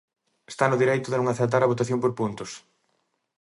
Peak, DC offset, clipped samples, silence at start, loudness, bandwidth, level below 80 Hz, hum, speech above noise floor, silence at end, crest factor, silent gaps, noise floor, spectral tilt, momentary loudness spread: -6 dBFS; under 0.1%; under 0.1%; 0.5 s; -24 LUFS; 11.5 kHz; -66 dBFS; none; 50 dB; 0.85 s; 20 dB; none; -73 dBFS; -6 dB/octave; 16 LU